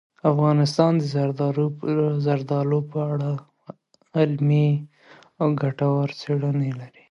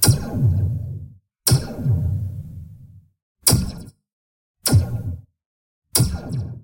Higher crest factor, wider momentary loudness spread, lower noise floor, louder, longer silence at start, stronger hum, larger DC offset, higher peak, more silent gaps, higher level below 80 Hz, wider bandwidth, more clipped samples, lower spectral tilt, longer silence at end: about the same, 18 dB vs 22 dB; second, 7 LU vs 19 LU; first, -52 dBFS vs -45 dBFS; about the same, -23 LUFS vs -21 LUFS; first, 0.25 s vs 0 s; neither; neither; second, -4 dBFS vs 0 dBFS; second, none vs 3.22-3.35 s, 4.13-4.54 s, 5.46-5.82 s; second, -68 dBFS vs -38 dBFS; second, 10.5 kHz vs 16.5 kHz; neither; first, -8.5 dB/octave vs -4.5 dB/octave; first, 0.25 s vs 0 s